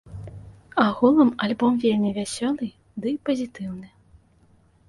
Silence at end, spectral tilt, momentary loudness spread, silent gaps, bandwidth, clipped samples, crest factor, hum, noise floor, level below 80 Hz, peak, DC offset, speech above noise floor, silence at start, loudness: 1 s; -5.5 dB/octave; 19 LU; none; 11.5 kHz; under 0.1%; 18 dB; none; -58 dBFS; -56 dBFS; -6 dBFS; under 0.1%; 36 dB; 0.05 s; -23 LUFS